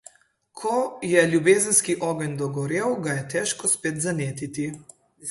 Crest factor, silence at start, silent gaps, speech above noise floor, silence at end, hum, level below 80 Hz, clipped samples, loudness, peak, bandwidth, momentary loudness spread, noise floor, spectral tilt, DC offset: 22 dB; 0.55 s; none; 36 dB; 0 s; none; -64 dBFS; under 0.1%; -23 LUFS; -4 dBFS; 12 kHz; 12 LU; -60 dBFS; -4 dB/octave; under 0.1%